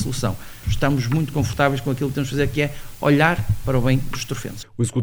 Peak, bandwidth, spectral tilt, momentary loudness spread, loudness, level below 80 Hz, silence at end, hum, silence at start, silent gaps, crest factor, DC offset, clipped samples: -2 dBFS; over 20 kHz; -6 dB/octave; 10 LU; -22 LUFS; -34 dBFS; 0 s; none; 0 s; none; 18 dB; under 0.1%; under 0.1%